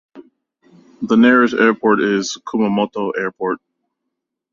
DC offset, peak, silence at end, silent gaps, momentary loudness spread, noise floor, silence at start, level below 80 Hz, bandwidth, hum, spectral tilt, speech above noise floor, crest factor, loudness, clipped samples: under 0.1%; -2 dBFS; 0.95 s; none; 12 LU; -78 dBFS; 0.15 s; -60 dBFS; 7.4 kHz; none; -5 dB/octave; 63 dB; 16 dB; -16 LUFS; under 0.1%